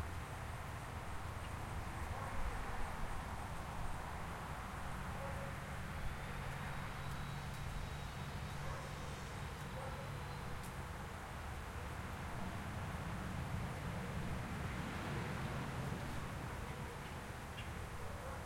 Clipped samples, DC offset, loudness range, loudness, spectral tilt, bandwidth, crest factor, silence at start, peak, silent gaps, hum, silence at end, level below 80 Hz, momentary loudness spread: under 0.1%; under 0.1%; 3 LU; -46 LUFS; -5.5 dB/octave; 16.5 kHz; 14 dB; 0 s; -30 dBFS; none; none; 0 s; -50 dBFS; 4 LU